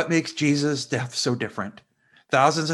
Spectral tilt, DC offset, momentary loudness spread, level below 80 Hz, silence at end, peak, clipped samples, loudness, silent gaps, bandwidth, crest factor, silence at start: -4.5 dB/octave; under 0.1%; 11 LU; -68 dBFS; 0 s; -4 dBFS; under 0.1%; -24 LUFS; none; 12 kHz; 20 dB; 0 s